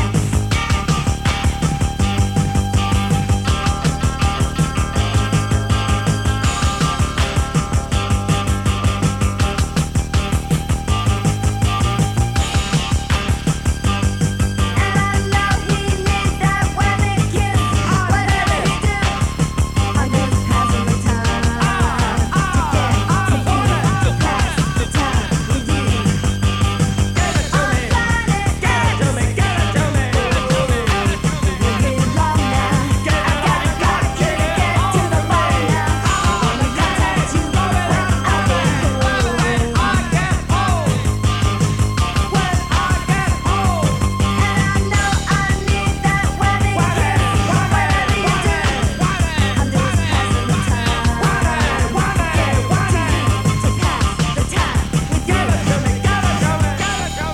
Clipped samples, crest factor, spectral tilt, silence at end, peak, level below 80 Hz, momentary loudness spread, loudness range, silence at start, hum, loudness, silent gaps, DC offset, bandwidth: under 0.1%; 14 dB; -5 dB/octave; 0 s; -2 dBFS; -24 dBFS; 3 LU; 2 LU; 0 s; none; -17 LUFS; none; under 0.1%; 16 kHz